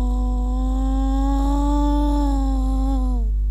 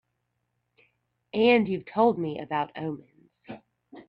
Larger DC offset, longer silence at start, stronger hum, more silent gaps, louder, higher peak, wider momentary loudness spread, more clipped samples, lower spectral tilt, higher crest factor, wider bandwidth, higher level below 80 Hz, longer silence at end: first, 0.3% vs under 0.1%; second, 0 s vs 1.35 s; neither; neither; first, -22 LUFS vs -26 LUFS; about the same, -10 dBFS vs -8 dBFS; second, 3 LU vs 24 LU; neither; about the same, -8 dB/octave vs -8.5 dB/octave; second, 8 dB vs 22 dB; first, 8.2 kHz vs 5.4 kHz; first, -20 dBFS vs -70 dBFS; about the same, 0 s vs 0.05 s